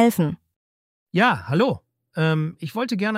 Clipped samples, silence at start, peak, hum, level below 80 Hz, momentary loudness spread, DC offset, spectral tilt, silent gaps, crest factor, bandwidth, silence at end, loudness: under 0.1%; 0 s; -4 dBFS; none; -60 dBFS; 12 LU; under 0.1%; -6.5 dB/octave; 0.56-1.07 s; 20 dB; 16 kHz; 0 s; -22 LUFS